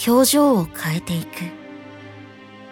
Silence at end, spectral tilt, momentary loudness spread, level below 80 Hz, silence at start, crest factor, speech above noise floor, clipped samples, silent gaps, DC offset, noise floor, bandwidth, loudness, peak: 0 s; -4.5 dB/octave; 25 LU; -54 dBFS; 0 s; 16 dB; 23 dB; under 0.1%; none; under 0.1%; -41 dBFS; 19 kHz; -19 LUFS; -6 dBFS